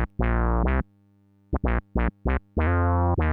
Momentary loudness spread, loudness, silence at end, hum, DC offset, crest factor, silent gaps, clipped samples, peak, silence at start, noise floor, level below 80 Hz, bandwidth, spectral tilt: 7 LU; -26 LUFS; 0 s; none; under 0.1%; 14 dB; none; under 0.1%; -10 dBFS; 0 s; -60 dBFS; -28 dBFS; 3.8 kHz; -11.5 dB/octave